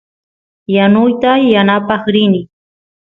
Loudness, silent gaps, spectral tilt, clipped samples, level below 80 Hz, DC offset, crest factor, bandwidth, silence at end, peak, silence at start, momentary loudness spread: -11 LUFS; none; -8.5 dB/octave; under 0.1%; -54 dBFS; under 0.1%; 12 dB; 4.1 kHz; 0.65 s; 0 dBFS; 0.7 s; 7 LU